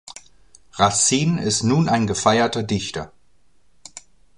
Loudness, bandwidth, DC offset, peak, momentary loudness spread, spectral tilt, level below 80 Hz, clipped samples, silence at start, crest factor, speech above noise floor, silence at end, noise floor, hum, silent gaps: -19 LUFS; 11.5 kHz; 0.3%; -2 dBFS; 23 LU; -4 dB/octave; -50 dBFS; under 0.1%; 0.05 s; 20 dB; 44 dB; 0.4 s; -63 dBFS; none; none